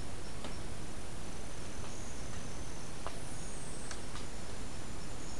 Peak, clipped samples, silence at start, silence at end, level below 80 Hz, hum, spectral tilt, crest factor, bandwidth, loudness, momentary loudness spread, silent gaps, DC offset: -20 dBFS; under 0.1%; 0 s; 0 s; -50 dBFS; none; -4 dB/octave; 20 dB; 12 kHz; -45 LUFS; 2 LU; none; 2%